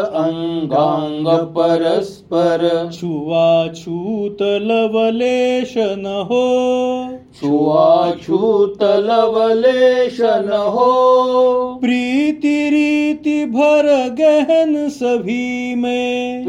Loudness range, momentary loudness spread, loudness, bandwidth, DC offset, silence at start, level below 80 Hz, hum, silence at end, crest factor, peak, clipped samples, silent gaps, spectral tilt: 3 LU; 8 LU; -15 LUFS; 11 kHz; under 0.1%; 0 s; -56 dBFS; none; 0 s; 14 dB; -2 dBFS; under 0.1%; none; -6 dB/octave